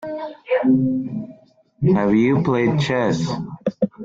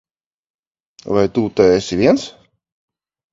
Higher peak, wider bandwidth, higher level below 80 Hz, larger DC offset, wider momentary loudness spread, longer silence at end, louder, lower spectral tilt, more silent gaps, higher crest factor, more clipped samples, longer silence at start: second, -6 dBFS vs 0 dBFS; about the same, 7.8 kHz vs 7.8 kHz; about the same, -52 dBFS vs -48 dBFS; neither; first, 13 LU vs 7 LU; second, 0 s vs 1.05 s; second, -20 LUFS vs -16 LUFS; first, -7.5 dB/octave vs -6 dB/octave; neither; about the same, 14 dB vs 18 dB; neither; second, 0 s vs 1.05 s